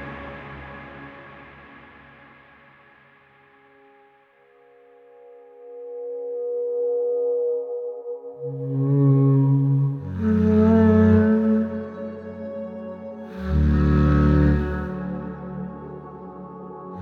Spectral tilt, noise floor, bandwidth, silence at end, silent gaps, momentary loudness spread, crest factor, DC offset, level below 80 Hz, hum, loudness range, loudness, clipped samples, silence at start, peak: -11 dB/octave; -56 dBFS; 4.7 kHz; 0 s; none; 21 LU; 16 dB; under 0.1%; -34 dBFS; none; 15 LU; -21 LUFS; under 0.1%; 0 s; -6 dBFS